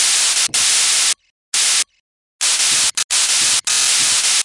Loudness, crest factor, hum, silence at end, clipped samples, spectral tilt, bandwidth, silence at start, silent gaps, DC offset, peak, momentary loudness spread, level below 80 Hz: -13 LUFS; 14 dB; none; 0 s; under 0.1%; 3.5 dB/octave; 11.5 kHz; 0 s; 1.30-1.52 s, 2.00-2.39 s, 3.04-3.09 s; 0.2%; -2 dBFS; 5 LU; -62 dBFS